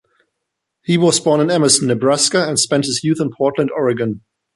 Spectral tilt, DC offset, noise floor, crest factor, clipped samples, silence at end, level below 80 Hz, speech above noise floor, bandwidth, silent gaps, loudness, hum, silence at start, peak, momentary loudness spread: -4 dB/octave; under 0.1%; -77 dBFS; 16 dB; under 0.1%; 0.35 s; -58 dBFS; 61 dB; 11.5 kHz; none; -15 LUFS; none; 0.9 s; 0 dBFS; 7 LU